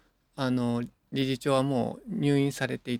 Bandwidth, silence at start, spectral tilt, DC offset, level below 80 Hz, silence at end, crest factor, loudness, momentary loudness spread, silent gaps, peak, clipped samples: 16 kHz; 0.35 s; -6.5 dB/octave; under 0.1%; -62 dBFS; 0 s; 18 dB; -29 LUFS; 8 LU; none; -12 dBFS; under 0.1%